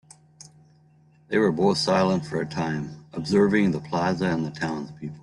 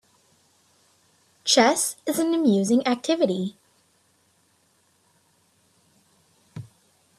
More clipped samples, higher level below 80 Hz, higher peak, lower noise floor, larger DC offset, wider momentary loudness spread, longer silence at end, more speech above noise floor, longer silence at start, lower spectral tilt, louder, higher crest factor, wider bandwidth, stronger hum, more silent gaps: neither; first, -60 dBFS vs -72 dBFS; second, -8 dBFS vs -2 dBFS; second, -57 dBFS vs -65 dBFS; neither; second, 12 LU vs 25 LU; second, 0 s vs 0.55 s; second, 33 dB vs 43 dB; second, 1.3 s vs 1.45 s; first, -6 dB/octave vs -3.5 dB/octave; about the same, -24 LUFS vs -22 LUFS; second, 16 dB vs 24 dB; second, 11.5 kHz vs 15 kHz; neither; neither